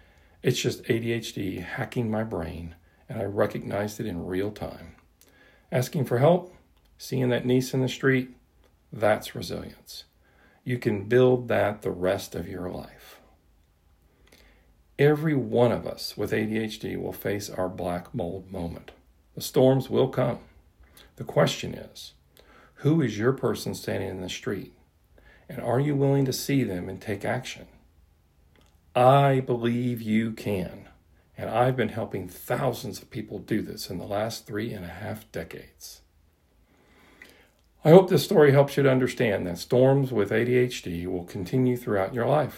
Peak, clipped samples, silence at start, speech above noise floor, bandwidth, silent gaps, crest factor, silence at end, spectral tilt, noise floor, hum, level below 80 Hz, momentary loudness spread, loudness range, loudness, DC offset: 0 dBFS; under 0.1%; 0.45 s; 38 dB; 16 kHz; none; 26 dB; 0 s; -6.5 dB/octave; -63 dBFS; none; -56 dBFS; 16 LU; 9 LU; -26 LUFS; under 0.1%